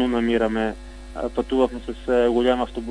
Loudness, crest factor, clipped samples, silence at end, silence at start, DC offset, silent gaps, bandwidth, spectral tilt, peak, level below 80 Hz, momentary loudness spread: -22 LUFS; 16 dB; under 0.1%; 0 s; 0 s; under 0.1%; none; 10.5 kHz; -6 dB/octave; -6 dBFS; -38 dBFS; 12 LU